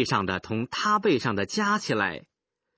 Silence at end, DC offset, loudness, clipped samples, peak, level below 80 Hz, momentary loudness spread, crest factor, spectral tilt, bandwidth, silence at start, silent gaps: 0.6 s; under 0.1%; -26 LUFS; under 0.1%; -8 dBFS; -56 dBFS; 7 LU; 18 dB; -4.5 dB/octave; 8 kHz; 0 s; none